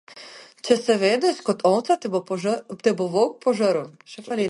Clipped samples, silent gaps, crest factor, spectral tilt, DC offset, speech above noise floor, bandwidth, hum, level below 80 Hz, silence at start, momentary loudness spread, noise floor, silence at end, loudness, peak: under 0.1%; none; 20 dB; -5 dB/octave; under 0.1%; 22 dB; 11.5 kHz; none; -72 dBFS; 0.1 s; 19 LU; -44 dBFS; 0 s; -22 LUFS; -2 dBFS